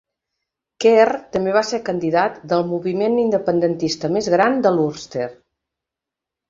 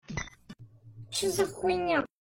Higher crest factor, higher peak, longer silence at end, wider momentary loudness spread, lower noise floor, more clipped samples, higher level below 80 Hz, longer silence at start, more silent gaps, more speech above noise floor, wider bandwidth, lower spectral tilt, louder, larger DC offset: about the same, 18 dB vs 18 dB; first, -2 dBFS vs -14 dBFS; first, 1.15 s vs 0.15 s; second, 7 LU vs 23 LU; first, -86 dBFS vs -51 dBFS; neither; about the same, -60 dBFS vs -56 dBFS; first, 0.8 s vs 0.1 s; neither; first, 68 dB vs 22 dB; second, 7.6 kHz vs 16.5 kHz; first, -5.5 dB/octave vs -3.5 dB/octave; first, -19 LUFS vs -30 LUFS; neither